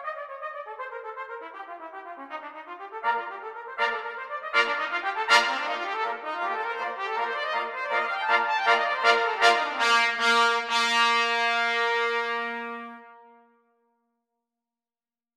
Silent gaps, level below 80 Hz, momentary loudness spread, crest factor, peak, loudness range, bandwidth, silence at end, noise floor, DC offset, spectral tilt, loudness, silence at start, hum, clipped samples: none; -80 dBFS; 18 LU; 22 dB; -4 dBFS; 12 LU; 15.5 kHz; 2.15 s; under -90 dBFS; under 0.1%; 0.5 dB/octave; -24 LUFS; 0 s; none; under 0.1%